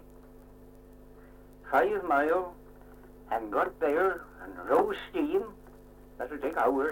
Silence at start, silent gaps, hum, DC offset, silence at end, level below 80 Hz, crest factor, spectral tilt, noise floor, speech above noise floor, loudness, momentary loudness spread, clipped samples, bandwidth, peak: 0.1 s; none; 50 Hz at -60 dBFS; under 0.1%; 0 s; -56 dBFS; 20 dB; -6 dB/octave; -52 dBFS; 23 dB; -29 LUFS; 15 LU; under 0.1%; 17 kHz; -12 dBFS